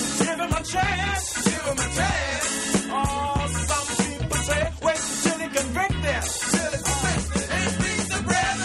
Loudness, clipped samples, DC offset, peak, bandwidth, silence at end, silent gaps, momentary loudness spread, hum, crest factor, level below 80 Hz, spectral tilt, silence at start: -24 LUFS; under 0.1%; under 0.1%; -6 dBFS; 13.5 kHz; 0 s; none; 2 LU; none; 18 dB; -36 dBFS; -3.5 dB/octave; 0 s